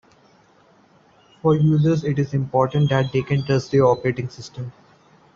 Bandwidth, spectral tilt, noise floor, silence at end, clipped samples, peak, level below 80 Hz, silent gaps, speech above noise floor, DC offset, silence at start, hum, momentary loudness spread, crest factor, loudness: 7.2 kHz; -8 dB/octave; -55 dBFS; 0.65 s; under 0.1%; -4 dBFS; -52 dBFS; none; 36 dB; under 0.1%; 1.45 s; none; 16 LU; 18 dB; -20 LUFS